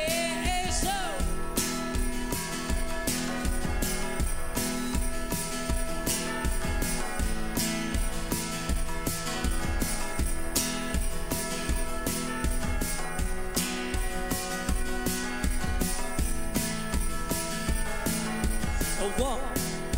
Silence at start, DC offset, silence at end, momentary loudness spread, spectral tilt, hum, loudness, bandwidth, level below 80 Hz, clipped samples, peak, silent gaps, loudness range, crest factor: 0 s; under 0.1%; 0 s; 3 LU; -3.5 dB/octave; none; -30 LUFS; 16.5 kHz; -32 dBFS; under 0.1%; -12 dBFS; none; 1 LU; 16 dB